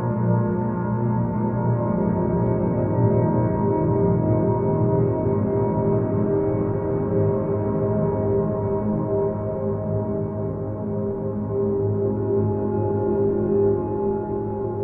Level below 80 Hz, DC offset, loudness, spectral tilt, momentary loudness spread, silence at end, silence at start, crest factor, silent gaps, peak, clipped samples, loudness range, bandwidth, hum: -42 dBFS; under 0.1%; -22 LUFS; -14 dB/octave; 6 LU; 0 s; 0 s; 14 dB; none; -8 dBFS; under 0.1%; 4 LU; 2.7 kHz; none